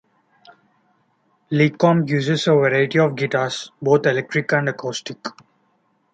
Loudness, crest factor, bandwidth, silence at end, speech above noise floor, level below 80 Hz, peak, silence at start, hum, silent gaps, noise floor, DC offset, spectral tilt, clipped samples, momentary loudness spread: -19 LUFS; 18 dB; 9 kHz; 0.85 s; 46 dB; -64 dBFS; -2 dBFS; 1.5 s; none; none; -64 dBFS; under 0.1%; -6 dB/octave; under 0.1%; 12 LU